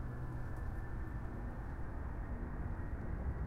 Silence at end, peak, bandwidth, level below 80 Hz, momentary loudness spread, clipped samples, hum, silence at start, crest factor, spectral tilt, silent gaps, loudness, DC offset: 0 s; -28 dBFS; 10 kHz; -44 dBFS; 2 LU; under 0.1%; none; 0 s; 12 dB; -9 dB/octave; none; -45 LUFS; under 0.1%